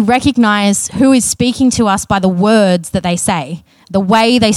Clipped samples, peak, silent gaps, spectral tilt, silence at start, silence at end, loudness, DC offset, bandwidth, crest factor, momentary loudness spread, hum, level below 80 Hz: under 0.1%; 0 dBFS; none; -4.5 dB/octave; 0 s; 0 s; -12 LUFS; under 0.1%; 14.5 kHz; 12 dB; 7 LU; none; -40 dBFS